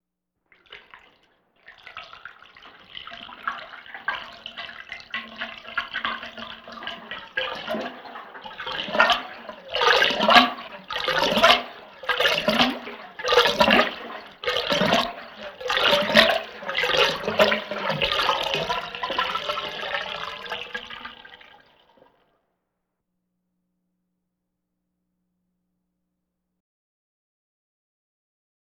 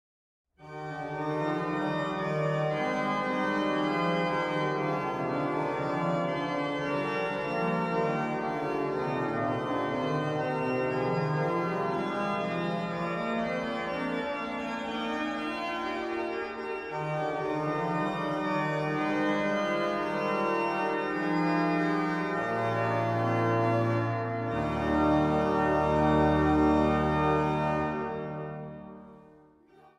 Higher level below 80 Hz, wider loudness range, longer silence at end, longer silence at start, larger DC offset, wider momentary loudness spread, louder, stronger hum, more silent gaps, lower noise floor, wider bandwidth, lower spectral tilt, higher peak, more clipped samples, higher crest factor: second, -56 dBFS vs -50 dBFS; first, 16 LU vs 6 LU; first, 7.25 s vs 0.75 s; about the same, 0.7 s vs 0.6 s; neither; first, 21 LU vs 7 LU; first, -22 LUFS vs -29 LUFS; neither; neither; first, -80 dBFS vs -58 dBFS; first, over 20 kHz vs 10.5 kHz; second, -3 dB/octave vs -7 dB/octave; first, -2 dBFS vs -14 dBFS; neither; first, 26 dB vs 16 dB